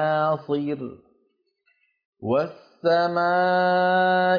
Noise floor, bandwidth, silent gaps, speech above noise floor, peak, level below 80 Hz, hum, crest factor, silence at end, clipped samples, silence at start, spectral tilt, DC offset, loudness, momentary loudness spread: -70 dBFS; 5.2 kHz; 2.05-2.13 s; 48 dB; -10 dBFS; -72 dBFS; none; 12 dB; 0 s; under 0.1%; 0 s; -7.5 dB/octave; under 0.1%; -22 LUFS; 13 LU